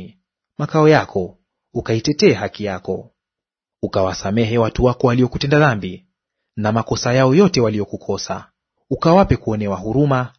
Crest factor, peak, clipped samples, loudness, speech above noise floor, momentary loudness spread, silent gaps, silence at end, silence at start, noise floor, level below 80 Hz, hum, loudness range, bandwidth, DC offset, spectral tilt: 18 dB; 0 dBFS; under 0.1%; -17 LUFS; 70 dB; 14 LU; none; 0.1 s; 0 s; -87 dBFS; -40 dBFS; none; 3 LU; 6.6 kHz; under 0.1%; -6.5 dB/octave